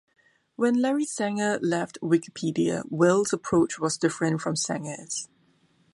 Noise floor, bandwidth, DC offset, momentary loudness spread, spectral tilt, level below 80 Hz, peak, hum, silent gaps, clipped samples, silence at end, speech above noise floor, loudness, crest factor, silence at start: -64 dBFS; 11.5 kHz; under 0.1%; 10 LU; -5 dB/octave; -64 dBFS; -8 dBFS; none; none; under 0.1%; 0.7 s; 39 dB; -26 LUFS; 18 dB; 0.6 s